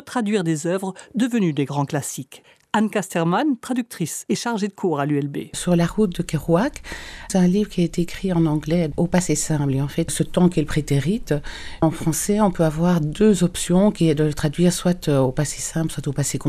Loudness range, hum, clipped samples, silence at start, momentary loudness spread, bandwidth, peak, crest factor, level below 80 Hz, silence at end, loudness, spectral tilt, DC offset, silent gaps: 4 LU; none; under 0.1%; 0.05 s; 8 LU; 14.5 kHz; -4 dBFS; 16 dB; -40 dBFS; 0 s; -21 LUFS; -6 dB/octave; under 0.1%; none